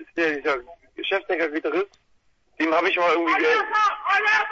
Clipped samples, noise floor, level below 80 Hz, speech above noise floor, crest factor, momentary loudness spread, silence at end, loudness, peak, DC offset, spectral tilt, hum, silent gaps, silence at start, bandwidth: under 0.1%; -62 dBFS; -64 dBFS; 41 dB; 14 dB; 8 LU; 0 s; -22 LUFS; -8 dBFS; under 0.1%; -3 dB/octave; none; none; 0 s; 7.8 kHz